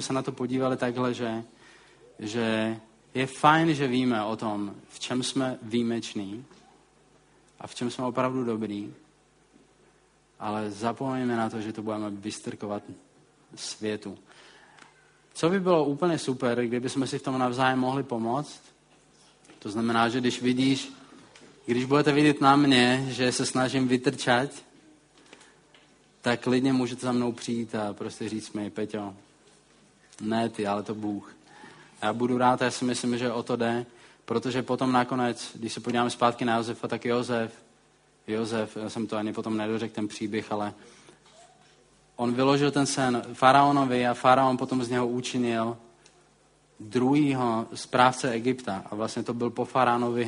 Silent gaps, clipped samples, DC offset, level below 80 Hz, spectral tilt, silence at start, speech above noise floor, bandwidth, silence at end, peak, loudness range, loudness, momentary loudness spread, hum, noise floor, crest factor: none; under 0.1%; under 0.1%; -68 dBFS; -5 dB/octave; 0 s; 36 dB; 10.5 kHz; 0 s; -4 dBFS; 10 LU; -27 LUFS; 13 LU; none; -62 dBFS; 24 dB